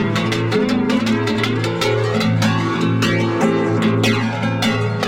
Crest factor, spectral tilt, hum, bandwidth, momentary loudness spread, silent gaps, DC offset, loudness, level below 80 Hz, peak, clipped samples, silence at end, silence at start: 14 dB; -6 dB/octave; none; 16 kHz; 2 LU; none; under 0.1%; -17 LUFS; -48 dBFS; -4 dBFS; under 0.1%; 0 s; 0 s